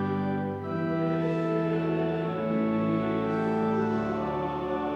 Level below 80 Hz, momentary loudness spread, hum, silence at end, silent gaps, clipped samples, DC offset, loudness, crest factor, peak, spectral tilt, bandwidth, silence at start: -56 dBFS; 4 LU; none; 0 s; none; under 0.1%; under 0.1%; -28 LUFS; 12 dB; -16 dBFS; -9 dB/octave; 7 kHz; 0 s